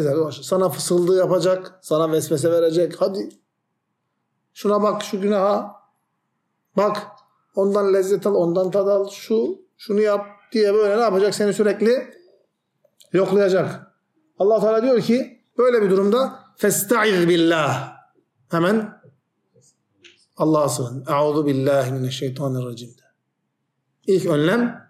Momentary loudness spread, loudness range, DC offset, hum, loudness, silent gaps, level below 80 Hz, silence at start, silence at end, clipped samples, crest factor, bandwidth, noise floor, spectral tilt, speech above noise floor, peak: 9 LU; 5 LU; under 0.1%; none; -20 LUFS; none; -72 dBFS; 0 s; 0.1 s; under 0.1%; 14 dB; 16 kHz; -75 dBFS; -5.5 dB/octave; 56 dB; -6 dBFS